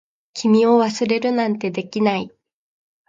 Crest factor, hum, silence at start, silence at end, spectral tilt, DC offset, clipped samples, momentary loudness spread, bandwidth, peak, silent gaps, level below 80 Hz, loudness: 16 dB; none; 0.35 s; 0.8 s; -5.5 dB/octave; under 0.1%; under 0.1%; 12 LU; 7.8 kHz; -4 dBFS; none; -66 dBFS; -19 LUFS